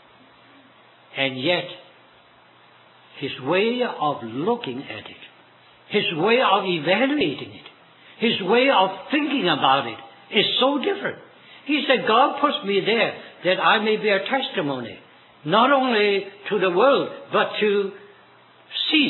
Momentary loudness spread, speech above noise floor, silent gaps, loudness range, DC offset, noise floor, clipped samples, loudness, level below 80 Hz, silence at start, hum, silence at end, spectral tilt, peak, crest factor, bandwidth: 14 LU; 32 dB; none; 6 LU; under 0.1%; -53 dBFS; under 0.1%; -21 LUFS; -74 dBFS; 1.15 s; none; 0 s; -7.5 dB/octave; -2 dBFS; 20 dB; 4.3 kHz